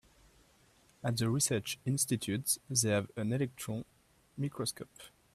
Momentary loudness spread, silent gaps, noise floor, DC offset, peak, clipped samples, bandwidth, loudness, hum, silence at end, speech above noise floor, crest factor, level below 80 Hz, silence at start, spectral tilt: 17 LU; none; -66 dBFS; under 0.1%; -14 dBFS; under 0.1%; 15.5 kHz; -34 LUFS; none; 0.25 s; 32 dB; 22 dB; -68 dBFS; 1.05 s; -4 dB/octave